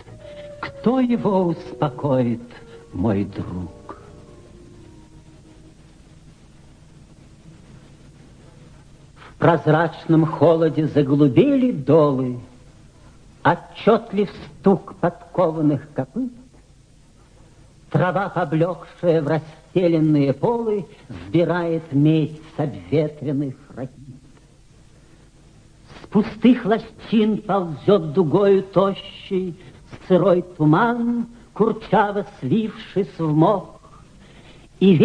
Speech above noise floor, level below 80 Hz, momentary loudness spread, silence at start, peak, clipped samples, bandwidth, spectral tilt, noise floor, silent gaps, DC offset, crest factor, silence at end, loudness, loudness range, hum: 31 dB; -52 dBFS; 15 LU; 0.1 s; -2 dBFS; under 0.1%; 9.8 kHz; -9 dB/octave; -50 dBFS; none; under 0.1%; 18 dB; 0 s; -20 LUFS; 9 LU; none